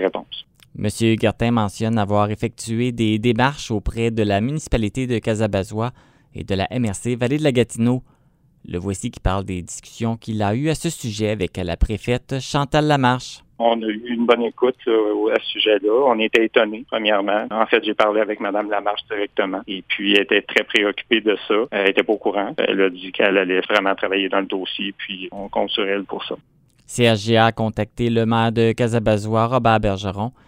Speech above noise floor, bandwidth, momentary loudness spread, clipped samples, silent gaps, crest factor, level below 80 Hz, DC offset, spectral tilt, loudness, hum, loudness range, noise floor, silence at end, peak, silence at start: 38 dB; 16 kHz; 9 LU; under 0.1%; none; 20 dB; -38 dBFS; under 0.1%; -5.5 dB/octave; -20 LUFS; none; 5 LU; -57 dBFS; 0.15 s; 0 dBFS; 0 s